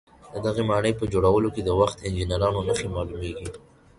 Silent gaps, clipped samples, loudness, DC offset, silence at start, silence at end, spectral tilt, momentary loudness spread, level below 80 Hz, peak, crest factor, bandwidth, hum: none; under 0.1%; -25 LUFS; under 0.1%; 0.25 s; 0.4 s; -6 dB/octave; 12 LU; -40 dBFS; -6 dBFS; 18 dB; 11.5 kHz; none